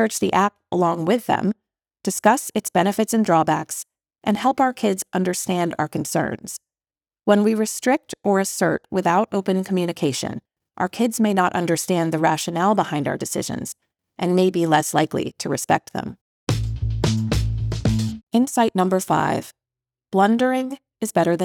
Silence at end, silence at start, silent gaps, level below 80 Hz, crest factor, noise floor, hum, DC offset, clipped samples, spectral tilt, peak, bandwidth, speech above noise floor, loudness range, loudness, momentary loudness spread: 0 s; 0 s; 16.21-16.47 s, 18.23-18.27 s; -40 dBFS; 18 dB; under -90 dBFS; none; under 0.1%; under 0.1%; -5 dB/octave; -2 dBFS; over 20 kHz; over 70 dB; 2 LU; -21 LUFS; 10 LU